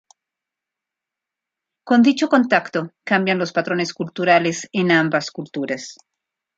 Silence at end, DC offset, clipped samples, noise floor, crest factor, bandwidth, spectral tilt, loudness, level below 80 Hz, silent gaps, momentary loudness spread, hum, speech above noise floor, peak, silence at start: 0.65 s; under 0.1%; under 0.1%; -86 dBFS; 18 dB; 8 kHz; -5 dB/octave; -19 LUFS; -68 dBFS; none; 11 LU; none; 67 dB; -2 dBFS; 1.85 s